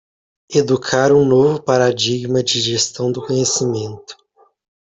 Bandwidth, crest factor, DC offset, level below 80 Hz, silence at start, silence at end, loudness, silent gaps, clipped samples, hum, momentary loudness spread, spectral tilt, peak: 8.4 kHz; 16 dB; under 0.1%; -54 dBFS; 0.5 s; 0.75 s; -16 LUFS; none; under 0.1%; none; 9 LU; -4 dB/octave; 0 dBFS